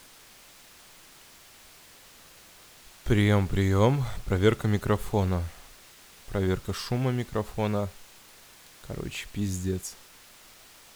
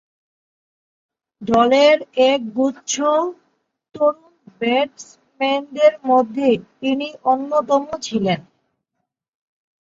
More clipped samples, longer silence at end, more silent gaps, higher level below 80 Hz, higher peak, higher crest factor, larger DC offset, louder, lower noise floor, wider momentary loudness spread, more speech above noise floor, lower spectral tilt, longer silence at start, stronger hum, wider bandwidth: neither; second, 1 s vs 1.5 s; neither; first, -46 dBFS vs -60 dBFS; second, -8 dBFS vs -2 dBFS; about the same, 20 dB vs 18 dB; neither; second, -28 LUFS vs -18 LUFS; second, -53 dBFS vs -78 dBFS; first, 26 LU vs 10 LU; second, 26 dB vs 60 dB; first, -6.5 dB/octave vs -4 dB/octave; first, 3.05 s vs 1.4 s; neither; first, over 20 kHz vs 7.8 kHz